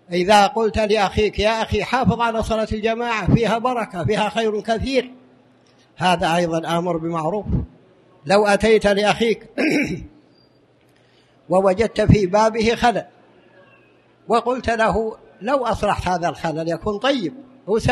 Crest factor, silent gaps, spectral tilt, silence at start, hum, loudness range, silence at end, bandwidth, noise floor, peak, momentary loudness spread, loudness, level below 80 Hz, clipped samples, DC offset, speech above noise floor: 18 dB; none; -5.5 dB/octave; 0.1 s; none; 3 LU; 0 s; 13 kHz; -56 dBFS; -2 dBFS; 8 LU; -19 LUFS; -38 dBFS; under 0.1%; under 0.1%; 37 dB